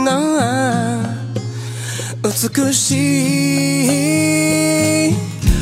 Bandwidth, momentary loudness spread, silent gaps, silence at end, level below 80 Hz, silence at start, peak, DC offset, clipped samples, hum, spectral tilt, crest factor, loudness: 16 kHz; 10 LU; none; 0 s; -30 dBFS; 0 s; 0 dBFS; under 0.1%; under 0.1%; none; -4.5 dB/octave; 16 dB; -16 LUFS